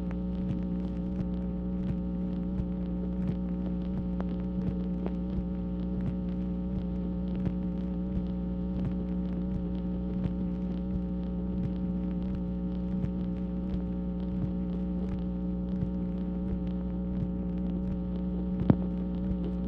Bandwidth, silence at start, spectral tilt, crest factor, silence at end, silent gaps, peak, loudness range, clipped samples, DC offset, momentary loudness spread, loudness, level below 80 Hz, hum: 4.3 kHz; 0 s; -11.5 dB/octave; 24 dB; 0 s; none; -6 dBFS; 1 LU; under 0.1%; under 0.1%; 1 LU; -33 LUFS; -38 dBFS; none